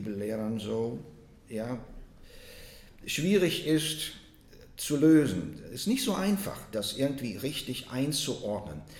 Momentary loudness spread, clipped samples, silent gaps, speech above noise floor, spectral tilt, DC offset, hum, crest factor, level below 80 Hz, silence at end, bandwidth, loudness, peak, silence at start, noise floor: 18 LU; under 0.1%; none; 24 dB; -5 dB/octave; under 0.1%; none; 18 dB; -54 dBFS; 0 s; 18 kHz; -30 LUFS; -12 dBFS; 0 s; -53 dBFS